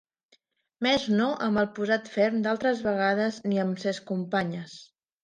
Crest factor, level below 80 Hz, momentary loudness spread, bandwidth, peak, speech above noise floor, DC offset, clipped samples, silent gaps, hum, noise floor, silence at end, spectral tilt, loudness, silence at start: 16 dB; -66 dBFS; 7 LU; 9.4 kHz; -10 dBFS; 41 dB; under 0.1%; under 0.1%; none; none; -67 dBFS; 0.4 s; -5.5 dB/octave; -27 LUFS; 0.8 s